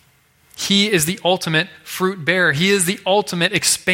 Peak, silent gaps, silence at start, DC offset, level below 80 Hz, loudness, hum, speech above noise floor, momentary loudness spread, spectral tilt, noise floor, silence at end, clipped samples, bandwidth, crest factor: -2 dBFS; none; 0.55 s; under 0.1%; -58 dBFS; -17 LUFS; none; 38 dB; 7 LU; -3 dB/octave; -56 dBFS; 0 s; under 0.1%; 16.5 kHz; 18 dB